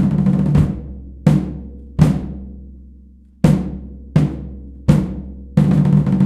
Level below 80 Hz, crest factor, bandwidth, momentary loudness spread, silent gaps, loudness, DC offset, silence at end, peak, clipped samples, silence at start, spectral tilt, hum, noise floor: -30 dBFS; 16 dB; 10 kHz; 18 LU; none; -17 LUFS; under 0.1%; 0 s; 0 dBFS; under 0.1%; 0 s; -9 dB/octave; none; -44 dBFS